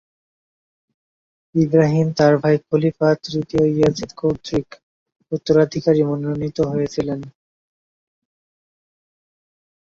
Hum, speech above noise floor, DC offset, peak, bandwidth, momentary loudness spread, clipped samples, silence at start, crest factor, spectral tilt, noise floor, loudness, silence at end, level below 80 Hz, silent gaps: none; over 72 dB; under 0.1%; -2 dBFS; 7.4 kHz; 9 LU; under 0.1%; 1.55 s; 18 dB; -7.5 dB/octave; under -90 dBFS; -19 LUFS; 2.7 s; -52 dBFS; 4.83-5.06 s